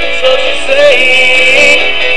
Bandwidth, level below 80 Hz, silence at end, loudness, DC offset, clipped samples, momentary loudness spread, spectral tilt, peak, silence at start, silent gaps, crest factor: 11 kHz; -36 dBFS; 0 s; -5 LUFS; 20%; 0.9%; 6 LU; -1 dB/octave; 0 dBFS; 0 s; none; 10 dB